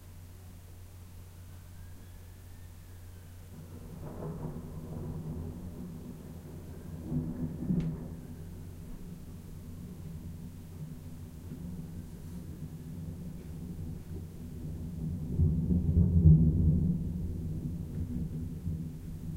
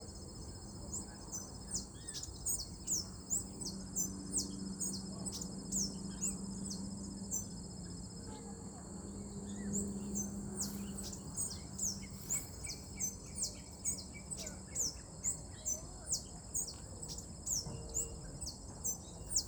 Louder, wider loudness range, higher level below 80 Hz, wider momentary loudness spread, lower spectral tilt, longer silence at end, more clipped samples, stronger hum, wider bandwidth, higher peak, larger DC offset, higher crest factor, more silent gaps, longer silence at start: first, -34 LUFS vs -41 LUFS; first, 17 LU vs 4 LU; first, -42 dBFS vs -56 dBFS; first, 22 LU vs 9 LU; first, -9.5 dB/octave vs -3 dB/octave; about the same, 0 s vs 0 s; neither; neither; second, 16 kHz vs over 20 kHz; first, -10 dBFS vs -22 dBFS; neither; about the same, 24 dB vs 20 dB; neither; about the same, 0 s vs 0 s